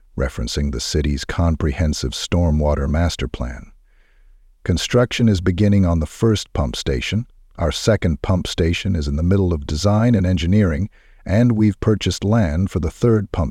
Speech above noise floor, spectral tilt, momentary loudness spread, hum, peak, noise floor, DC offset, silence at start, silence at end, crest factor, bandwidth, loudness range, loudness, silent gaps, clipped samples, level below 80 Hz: 33 dB; -6 dB/octave; 8 LU; none; -2 dBFS; -51 dBFS; under 0.1%; 0.15 s; 0 s; 16 dB; 13.5 kHz; 3 LU; -19 LUFS; none; under 0.1%; -30 dBFS